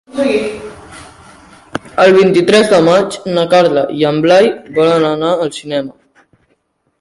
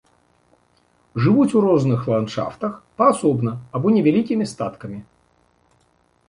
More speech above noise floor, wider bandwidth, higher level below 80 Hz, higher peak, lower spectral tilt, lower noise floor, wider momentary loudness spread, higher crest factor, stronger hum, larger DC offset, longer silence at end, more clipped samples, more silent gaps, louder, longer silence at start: first, 50 dB vs 43 dB; about the same, 11.5 kHz vs 11 kHz; first, -50 dBFS vs -58 dBFS; first, 0 dBFS vs -4 dBFS; second, -5.5 dB/octave vs -7.5 dB/octave; about the same, -61 dBFS vs -62 dBFS; about the same, 14 LU vs 13 LU; second, 12 dB vs 18 dB; neither; neither; second, 1.1 s vs 1.25 s; neither; neither; first, -11 LUFS vs -19 LUFS; second, 0.15 s vs 1.15 s